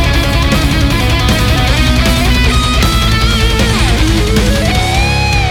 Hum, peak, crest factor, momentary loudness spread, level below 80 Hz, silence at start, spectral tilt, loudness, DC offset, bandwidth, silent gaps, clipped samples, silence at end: none; 0 dBFS; 10 dB; 1 LU; -14 dBFS; 0 s; -4.5 dB/octave; -11 LUFS; under 0.1%; 17.5 kHz; none; under 0.1%; 0 s